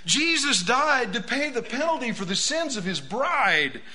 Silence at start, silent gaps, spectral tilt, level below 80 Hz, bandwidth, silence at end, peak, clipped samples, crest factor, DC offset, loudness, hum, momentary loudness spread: 0.05 s; none; -2 dB/octave; -60 dBFS; 11 kHz; 0 s; -6 dBFS; under 0.1%; 18 dB; 1%; -23 LUFS; none; 7 LU